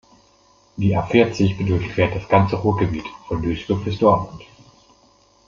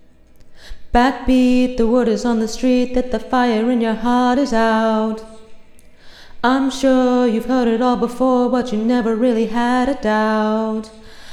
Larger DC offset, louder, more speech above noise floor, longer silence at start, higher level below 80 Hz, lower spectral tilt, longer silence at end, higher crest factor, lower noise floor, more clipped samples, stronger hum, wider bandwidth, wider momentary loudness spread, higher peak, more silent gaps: neither; second, -20 LUFS vs -17 LUFS; first, 37 dB vs 27 dB; first, 0.75 s vs 0.4 s; second, -44 dBFS vs -36 dBFS; first, -7.5 dB/octave vs -5.5 dB/octave; first, 1.05 s vs 0 s; about the same, 18 dB vs 16 dB; first, -55 dBFS vs -42 dBFS; neither; neither; second, 7.2 kHz vs 11.5 kHz; first, 9 LU vs 5 LU; about the same, -2 dBFS vs 0 dBFS; neither